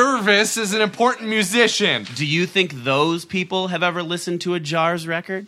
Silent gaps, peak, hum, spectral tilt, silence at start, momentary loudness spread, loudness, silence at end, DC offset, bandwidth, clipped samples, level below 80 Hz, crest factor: none; 0 dBFS; none; -3.5 dB/octave; 0 s; 8 LU; -19 LUFS; 0 s; under 0.1%; 16 kHz; under 0.1%; -66 dBFS; 20 dB